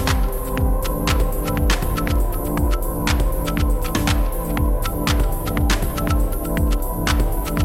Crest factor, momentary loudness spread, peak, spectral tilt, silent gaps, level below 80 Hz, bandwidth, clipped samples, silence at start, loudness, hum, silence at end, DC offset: 14 dB; 2 LU; -6 dBFS; -5 dB/octave; none; -20 dBFS; 16.5 kHz; under 0.1%; 0 s; -21 LUFS; none; 0 s; under 0.1%